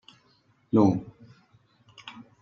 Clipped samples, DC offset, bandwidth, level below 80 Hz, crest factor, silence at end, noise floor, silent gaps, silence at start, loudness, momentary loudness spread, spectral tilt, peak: under 0.1%; under 0.1%; 7 kHz; -66 dBFS; 22 dB; 0.2 s; -65 dBFS; none; 0.75 s; -24 LUFS; 24 LU; -8.5 dB/octave; -8 dBFS